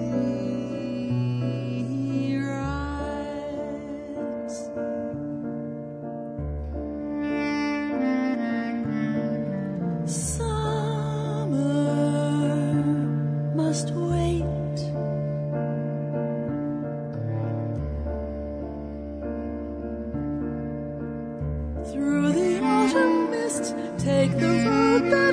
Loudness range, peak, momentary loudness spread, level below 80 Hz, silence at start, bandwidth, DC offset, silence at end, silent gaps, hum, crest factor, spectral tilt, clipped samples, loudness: 8 LU; -6 dBFS; 11 LU; -42 dBFS; 0 s; 11 kHz; under 0.1%; 0 s; none; none; 18 dB; -6.5 dB/octave; under 0.1%; -27 LUFS